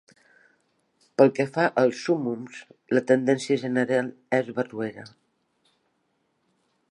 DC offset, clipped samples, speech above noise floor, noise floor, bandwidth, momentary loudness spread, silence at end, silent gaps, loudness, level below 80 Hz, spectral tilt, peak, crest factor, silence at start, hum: under 0.1%; under 0.1%; 49 dB; -72 dBFS; 11 kHz; 13 LU; 1.85 s; none; -24 LUFS; -78 dBFS; -6 dB/octave; -4 dBFS; 22 dB; 1.2 s; none